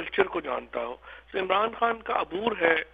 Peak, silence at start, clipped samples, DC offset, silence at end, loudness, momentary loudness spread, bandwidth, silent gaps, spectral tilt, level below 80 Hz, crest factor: -6 dBFS; 0 s; under 0.1%; under 0.1%; 0.05 s; -28 LUFS; 11 LU; 5 kHz; none; -6.5 dB/octave; -58 dBFS; 22 dB